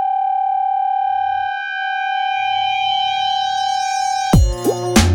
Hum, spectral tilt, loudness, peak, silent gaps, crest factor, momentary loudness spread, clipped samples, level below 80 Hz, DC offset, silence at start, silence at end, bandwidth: none; -4 dB/octave; -18 LUFS; 0 dBFS; none; 16 dB; 5 LU; under 0.1%; -28 dBFS; under 0.1%; 0 s; 0 s; over 20 kHz